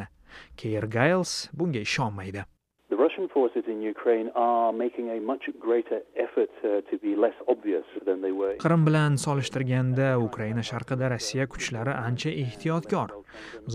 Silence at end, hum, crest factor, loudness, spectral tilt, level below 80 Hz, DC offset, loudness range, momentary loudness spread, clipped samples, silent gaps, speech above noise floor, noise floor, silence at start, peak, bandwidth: 0 s; none; 20 dB; -27 LUFS; -6 dB/octave; -58 dBFS; under 0.1%; 3 LU; 9 LU; under 0.1%; none; 23 dB; -50 dBFS; 0 s; -8 dBFS; 13.5 kHz